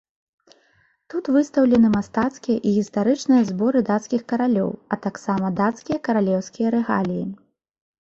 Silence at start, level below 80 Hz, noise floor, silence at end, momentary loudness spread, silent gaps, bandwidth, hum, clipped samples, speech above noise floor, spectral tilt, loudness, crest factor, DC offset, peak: 1.15 s; -58 dBFS; -62 dBFS; 0.65 s; 9 LU; none; 7.8 kHz; none; under 0.1%; 42 dB; -7 dB/octave; -21 LUFS; 16 dB; under 0.1%; -6 dBFS